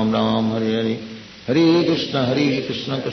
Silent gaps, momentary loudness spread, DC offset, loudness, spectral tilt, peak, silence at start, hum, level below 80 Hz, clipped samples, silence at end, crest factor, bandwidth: none; 10 LU; under 0.1%; -19 LUFS; -6.5 dB/octave; -6 dBFS; 0 s; none; -56 dBFS; under 0.1%; 0 s; 14 dB; 6.4 kHz